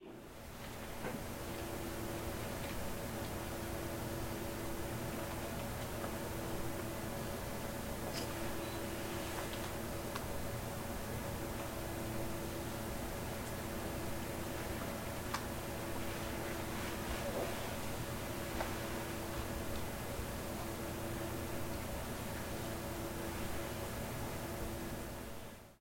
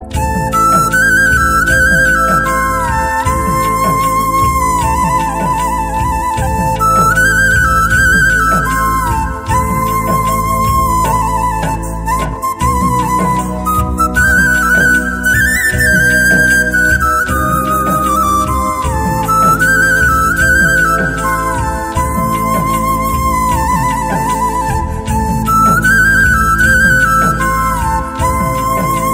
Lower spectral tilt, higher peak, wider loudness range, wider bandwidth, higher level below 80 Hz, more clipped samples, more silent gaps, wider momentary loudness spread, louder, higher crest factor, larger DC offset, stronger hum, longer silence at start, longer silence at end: about the same, -4.5 dB/octave vs -4.5 dB/octave; second, -24 dBFS vs 0 dBFS; second, 1 LU vs 4 LU; about the same, 16.5 kHz vs 16.5 kHz; second, -52 dBFS vs -22 dBFS; neither; neither; second, 2 LU vs 7 LU; second, -42 LUFS vs -11 LUFS; first, 18 dB vs 12 dB; first, 0.1% vs under 0.1%; neither; about the same, 0 s vs 0 s; about the same, 0 s vs 0 s